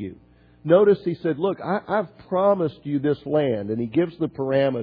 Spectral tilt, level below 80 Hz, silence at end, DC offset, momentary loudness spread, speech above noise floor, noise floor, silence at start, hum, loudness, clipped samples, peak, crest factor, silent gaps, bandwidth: -11 dB/octave; -60 dBFS; 0 s; under 0.1%; 9 LU; 31 dB; -53 dBFS; 0 s; none; -22 LUFS; under 0.1%; -4 dBFS; 18 dB; none; 5 kHz